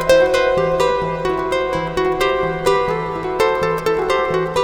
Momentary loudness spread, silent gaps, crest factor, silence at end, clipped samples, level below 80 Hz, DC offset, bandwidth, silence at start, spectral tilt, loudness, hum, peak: 5 LU; none; 14 dB; 0 s; under 0.1%; -38 dBFS; under 0.1%; over 20 kHz; 0 s; -5 dB/octave; -18 LUFS; none; -2 dBFS